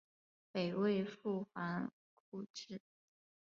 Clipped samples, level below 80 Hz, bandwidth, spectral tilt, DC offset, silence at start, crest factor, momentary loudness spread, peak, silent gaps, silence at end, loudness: under 0.1%; -84 dBFS; 7.2 kHz; -5.5 dB/octave; under 0.1%; 0.55 s; 18 dB; 15 LU; -24 dBFS; 1.93-2.32 s, 2.50-2.54 s; 0.7 s; -41 LUFS